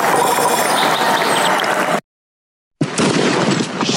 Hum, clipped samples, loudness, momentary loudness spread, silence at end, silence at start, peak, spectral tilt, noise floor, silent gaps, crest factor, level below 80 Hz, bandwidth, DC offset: none; under 0.1%; -15 LUFS; 5 LU; 0 s; 0 s; -4 dBFS; -3.5 dB/octave; under -90 dBFS; 2.04-2.71 s; 12 dB; -60 dBFS; 17 kHz; under 0.1%